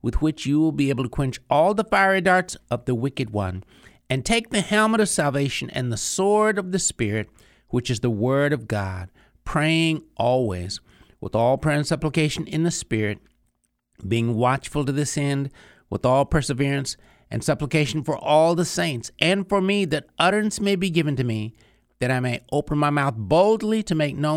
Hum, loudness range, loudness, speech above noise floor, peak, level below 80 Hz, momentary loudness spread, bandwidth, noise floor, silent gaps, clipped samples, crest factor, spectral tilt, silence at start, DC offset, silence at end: none; 3 LU; -22 LUFS; 49 dB; -2 dBFS; -44 dBFS; 9 LU; 16 kHz; -71 dBFS; none; under 0.1%; 20 dB; -5 dB/octave; 0.05 s; under 0.1%; 0 s